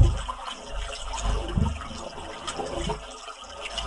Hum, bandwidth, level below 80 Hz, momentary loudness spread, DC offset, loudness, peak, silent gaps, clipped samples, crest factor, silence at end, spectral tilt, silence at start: none; 11.5 kHz; -32 dBFS; 9 LU; under 0.1%; -32 LUFS; -4 dBFS; none; under 0.1%; 24 dB; 0 s; -5 dB/octave; 0 s